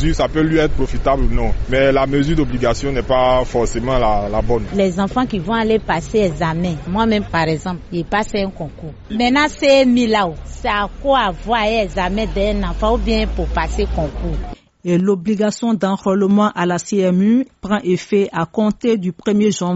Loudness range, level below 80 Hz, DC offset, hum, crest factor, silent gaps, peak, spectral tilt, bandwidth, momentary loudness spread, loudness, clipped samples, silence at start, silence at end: 3 LU; -26 dBFS; under 0.1%; none; 14 dB; none; -4 dBFS; -5 dB/octave; 8 kHz; 7 LU; -17 LUFS; under 0.1%; 0 s; 0 s